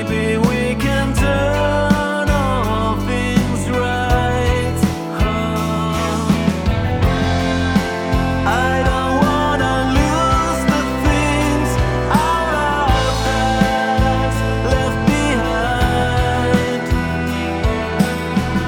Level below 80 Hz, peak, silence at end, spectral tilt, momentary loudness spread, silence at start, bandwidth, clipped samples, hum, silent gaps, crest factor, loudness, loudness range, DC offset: -24 dBFS; 0 dBFS; 0 s; -5.5 dB/octave; 3 LU; 0 s; 19.5 kHz; under 0.1%; none; none; 16 dB; -17 LUFS; 2 LU; under 0.1%